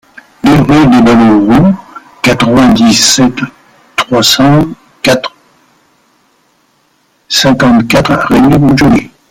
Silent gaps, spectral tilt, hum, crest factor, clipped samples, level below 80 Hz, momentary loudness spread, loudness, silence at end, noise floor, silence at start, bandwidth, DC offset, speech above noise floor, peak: none; -4.5 dB/octave; none; 8 dB; 0.1%; -34 dBFS; 9 LU; -7 LUFS; 0.25 s; -53 dBFS; 0.45 s; 17 kHz; under 0.1%; 47 dB; 0 dBFS